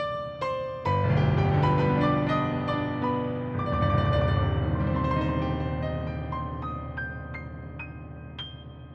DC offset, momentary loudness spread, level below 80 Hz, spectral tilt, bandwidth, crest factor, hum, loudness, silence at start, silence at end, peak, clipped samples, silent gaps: under 0.1%; 15 LU; -40 dBFS; -9 dB/octave; 6.4 kHz; 16 dB; none; -27 LUFS; 0 s; 0 s; -12 dBFS; under 0.1%; none